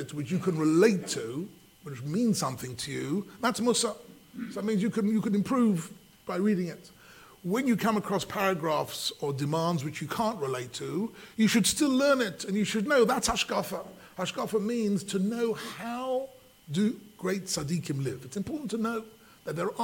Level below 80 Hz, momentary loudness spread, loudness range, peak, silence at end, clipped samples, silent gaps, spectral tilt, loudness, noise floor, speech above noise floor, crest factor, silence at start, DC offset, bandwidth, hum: -62 dBFS; 13 LU; 5 LU; -10 dBFS; 0 s; under 0.1%; none; -4.5 dB/octave; -29 LUFS; -52 dBFS; 24 dB; 20 dB; 0 s; under 0.1%; 17 kHz; none